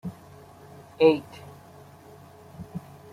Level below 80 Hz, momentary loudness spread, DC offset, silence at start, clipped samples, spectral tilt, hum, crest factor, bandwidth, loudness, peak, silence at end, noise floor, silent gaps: -64 dBFS; 28 LU; under 0.1%; 0.05 s; under 0.1%; -7 dB/octave; none; 24 dB; 15 kHz; -22 LUFS; -6 dBFS; 0.35 s; -49 dBFS; none